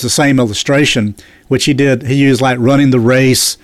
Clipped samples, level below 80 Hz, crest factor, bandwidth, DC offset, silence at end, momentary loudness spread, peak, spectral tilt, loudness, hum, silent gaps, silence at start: under 0.1%; -42 dBFS; 10 dB; 14.5 kHz; under 0.1%; 0.1 s; 5 LU; -2 dBFS; -4.5 dB/octave; -11 LUFS; none; none; 0 s